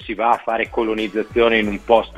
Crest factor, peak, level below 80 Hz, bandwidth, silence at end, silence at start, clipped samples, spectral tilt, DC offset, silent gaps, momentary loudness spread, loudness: 18 dB; 0 dBFS; -42 dBFS; 11.5 kHz; 0 s; 0 s; under 0.1%; -6 dB/octave; under 0.1%; none; 5 LU; -19 LUFS